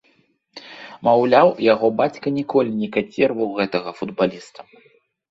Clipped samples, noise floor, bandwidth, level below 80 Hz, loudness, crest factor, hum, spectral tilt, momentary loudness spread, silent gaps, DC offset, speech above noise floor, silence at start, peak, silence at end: under 0.1%; -61 dBFS; 7.8 kHz; -64 dBFS; -19 LUFS; 18 dB; none; -7 dB/octave; 22 LU; none; under 0.1%; 42 dB; 0.55 s; -2 dBFS; 0.7 s